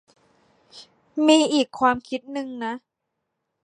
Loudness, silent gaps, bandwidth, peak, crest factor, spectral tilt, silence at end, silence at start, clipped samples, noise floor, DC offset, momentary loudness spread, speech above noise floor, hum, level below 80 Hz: -22 LUFS; none; 11 kHz; -4 dBFS; 20 dB; -3 dB/octave; 0.9 s; 0.75 s; under 0.1%; -80 dBFS; under 0.1%; 15 LU; 58 dB; none; -64 dBFS